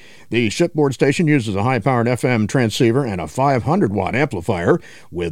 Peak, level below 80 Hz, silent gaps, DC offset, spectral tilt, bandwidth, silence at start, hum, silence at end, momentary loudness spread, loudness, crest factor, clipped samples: -2 dBFS; -48 dBFS; none; under 0.1%; -6.5 dB/octave; 16 kHz; 0 s; none; 0 s; 4 LU; -18 LUFS; 16 dB; under 0.1%